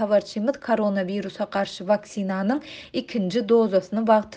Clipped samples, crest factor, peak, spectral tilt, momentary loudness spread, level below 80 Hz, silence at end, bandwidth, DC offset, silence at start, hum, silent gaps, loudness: under 0.1%; 18 dB; -6 dBFS; -6.5 dB/octave; 9 LU; -64 dBFS; 0 s; 9 kHz; under 0.1%; 0 s; none; none; -24 LUFS